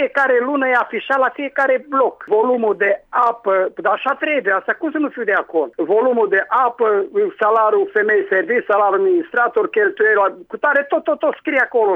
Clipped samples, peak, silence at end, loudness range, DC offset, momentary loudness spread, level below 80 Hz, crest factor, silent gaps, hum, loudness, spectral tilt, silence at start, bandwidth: under 0.1%; -4 dBFS; 0 s; 2 LU; under 0.1%; 4 LU; -68 dBFS; 12 dB; none; none; -17 LUFS; -6 dB/octave; 0 s; 4.6 kHz